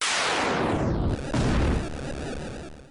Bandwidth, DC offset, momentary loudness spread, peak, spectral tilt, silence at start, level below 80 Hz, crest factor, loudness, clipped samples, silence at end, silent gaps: 11 kHz; under 0.1%; 12 LU; -14 dBFS; -4.5 dB/octave; 0 s; -34 dBFS; 12 dB; -26 LUFS; under 0.1%; 0 s; none